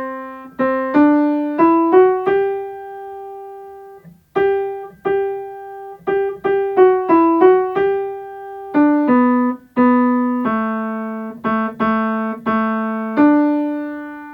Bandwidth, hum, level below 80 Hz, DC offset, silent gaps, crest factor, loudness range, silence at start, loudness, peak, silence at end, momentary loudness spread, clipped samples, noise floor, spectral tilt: 4.8 kHz; none; -56 dBFS; under 0.1%; none; 16 dB; 7 LU; 0 s; -16 LUFS; 0 dBFS; 0 s; 19 LU; under 0.1%; -41 dBFS; -8.5 dB/octave